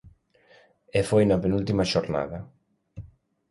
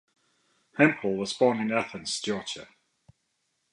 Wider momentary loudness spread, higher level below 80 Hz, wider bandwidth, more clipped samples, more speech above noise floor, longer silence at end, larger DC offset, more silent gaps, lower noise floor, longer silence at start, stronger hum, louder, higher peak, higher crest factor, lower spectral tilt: first, 24 LU vs 14 LU; first, -48 dBFS vs -70 dBFS; about the same, 11.5 kHz vs 11.5 kHz; neither; second, 35 dB vs 50 dB; second, 0.45 s vs 1.1 s; neither; neither; second, -58 dBFS vs -76 dBFS; second, 0.05 s vs 0.75 s; neither; about the same, -25 LUFS vs -27 LUFS; second, -8 dBFS vs -4 dBFS; second, 18 dB vs 24 dB; first, -6.5 dB/octave vs -4.5 dB/octave